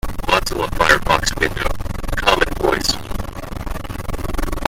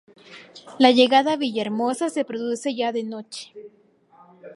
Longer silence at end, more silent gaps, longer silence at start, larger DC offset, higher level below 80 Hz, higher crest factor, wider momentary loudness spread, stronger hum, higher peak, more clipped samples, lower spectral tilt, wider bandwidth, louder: about the same, 0 s vs 0 s; neither; second, 0.05 s vs 0.3 s; neither; first, -26 dBFS vs -76 dBFS; about the same, 18 dB vs 22 dB; second, 14 LU vs 24 LU; neither; about the same, 0 dBFS vs 0 dBFS; neither; about the same, -3.5 dB/octave vs -3.5 dB/octave; first, 16.5 kHz vs 11.5 kHz; about the same, -19 LUFS vs -21 LUFS